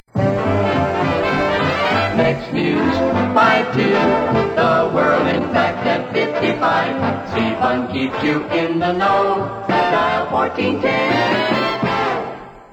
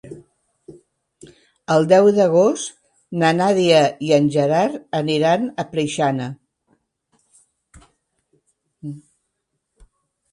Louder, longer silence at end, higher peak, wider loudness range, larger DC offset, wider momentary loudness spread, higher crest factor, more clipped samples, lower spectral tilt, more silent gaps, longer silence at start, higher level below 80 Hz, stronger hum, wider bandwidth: about the same, -17 LUFS vs -17 LUFS; second, 0.1 s vs 1.35 s; about the same, -2 dBFS vs 0 dBFS; second, 3 LU vs 11 LU; neither; second, 4 LU vs 21 LU; second, 14 dB vs 20 dB; neither; about the same, -6.5 dB/octave vs -5.5 dB/octave; neither; about the same, 0.15 s vs 0.05 s; first, -46 dBFS vs -62 dBFS; neither; first, 18 kHz vs 11.5 kHz